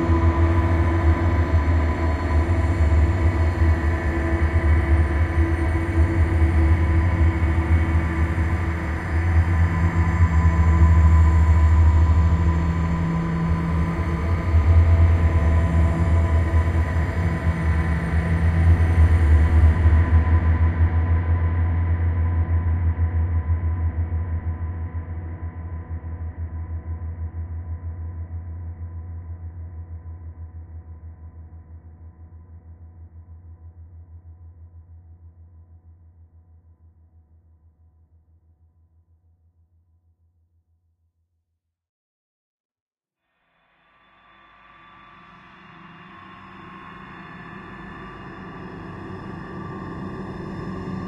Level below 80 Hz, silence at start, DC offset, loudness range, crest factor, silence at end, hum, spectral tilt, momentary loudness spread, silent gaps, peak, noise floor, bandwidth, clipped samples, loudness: -24 dBFS; 0 s; under 0.1%; 20 LU; 16 dB; 0 s; none; -8.5 dB/octave; 20 LU; 41.89-42.70 s, 42.80-42.91 s; -6 dBFS; -79 dBFS; 7.4 kHz; under 0.1%; -21 LUFS